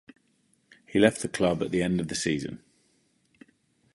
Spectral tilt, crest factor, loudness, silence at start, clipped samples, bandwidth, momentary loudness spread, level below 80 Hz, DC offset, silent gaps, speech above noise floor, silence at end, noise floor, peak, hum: -5 dB/octave; 24 dB; -26 LUFS; 0.9 s; under 0.1%; 11.5 kHz; 10 LU; -56 dBFS; under 0.1%; none; 43 dB; 1.35 s; -69 dBFS; -4 dBFS; none